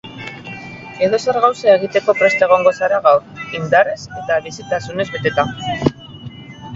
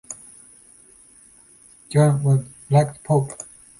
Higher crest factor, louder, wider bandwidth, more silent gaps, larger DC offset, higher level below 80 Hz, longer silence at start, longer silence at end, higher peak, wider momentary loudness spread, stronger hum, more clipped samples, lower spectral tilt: about the same, 16 dB vs 18 dB; first, -16 LUFS vs -20 LUFS; second, 7.8 kHz vs 11.5 kHz; neither; neither; first, -48 dBFS vs -58 dBFS; about the same, 0.05 s vs 0.1 s; second, 0 s vs 0.35 s; first, 0 dBFS vs -4 dBFS; about the same, 18 LU vs 19 LU; neither; neither; second, -5 dB/octave vs -7.5 dB/octave